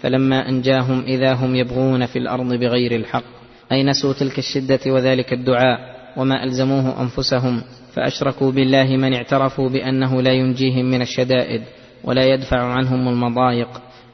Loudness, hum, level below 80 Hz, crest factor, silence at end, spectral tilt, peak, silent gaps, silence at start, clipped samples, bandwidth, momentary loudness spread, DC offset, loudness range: -18 LUFS; none; -46 dBFS; 16 dB; 0.3 s; -6.5 dB/octave; -2 dBFS; none; 0 s; under 0.1%; 6.4 kHz; 7 LU; under 0.1%; 2 LU